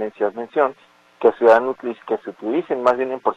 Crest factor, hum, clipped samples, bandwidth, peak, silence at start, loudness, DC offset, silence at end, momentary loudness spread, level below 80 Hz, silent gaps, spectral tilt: 18 dB; none; under 0.1%; 8 kHz; -2 dBFS; 0 s; -20 LUFS; under 0.1%; 0.05 s; 11 LU; -64 dBFS; none; -6.5 dB/octave